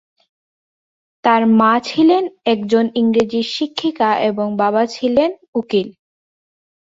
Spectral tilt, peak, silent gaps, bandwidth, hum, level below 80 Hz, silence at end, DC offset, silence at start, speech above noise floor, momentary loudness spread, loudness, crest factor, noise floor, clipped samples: -6 dB/octave; 0 dBFS; 5.48-5.53 s; 7.8 kHz; none; -58 dBFS; 0.95 s; under 0.1%; 1.25 s; over 75 dB; 7 LU; -16 LUFS; 16 dB; under -90 dBFS; under 0.1%